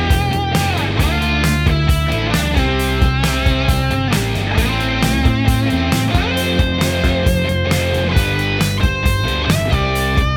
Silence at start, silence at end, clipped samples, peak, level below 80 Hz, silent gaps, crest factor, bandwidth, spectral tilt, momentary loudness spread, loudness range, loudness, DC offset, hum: 0 s; 0 s; under 0.1%; 0 dBFS; -22 dBFS; none; 14 dB; 19 kHz; -5 dB/octave; 2 LU; 0 LU; -16 LUFS; under 0.1%; none